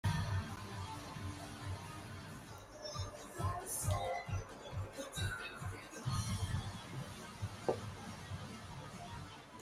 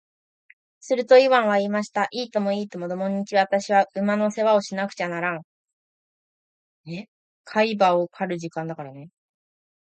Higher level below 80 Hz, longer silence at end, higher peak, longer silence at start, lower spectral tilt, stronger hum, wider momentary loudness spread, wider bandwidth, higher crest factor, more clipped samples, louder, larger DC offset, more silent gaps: first, -56 dBFS vs -76 dBFS; second, 0 s vs 0.75 s; second, -20 dBFS vs -4 dBFS; second, 0.05 s vs 0.85 s; about the same, -4.5 dB/octave vs -5.5 dB/octave; neither; second, 10 LU vs 16 LU; first, 15.5 kHz vs 8.8 kHz; about the same, 22 dB vs 20 dB; neither; second, -44 LUFS vs -22 LUFS; neither; second, none vs 5.44-5.64 s, 5.73-6.84 s, 7.08-7.44 s